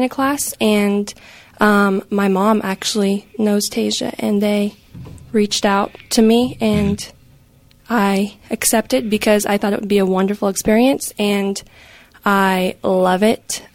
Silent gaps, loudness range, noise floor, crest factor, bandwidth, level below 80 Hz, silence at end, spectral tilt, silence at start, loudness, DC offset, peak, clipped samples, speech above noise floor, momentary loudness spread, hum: none; 2 LU; -50 dBFS; 16 dB; 16.5 kHz; -46 dBFS; 0.1 s; -4.5 dB/octave; 0 s; -17 LUFS; under 0.1%; -2 dBFS; under 0.1%; 33 dB; 7 LU; none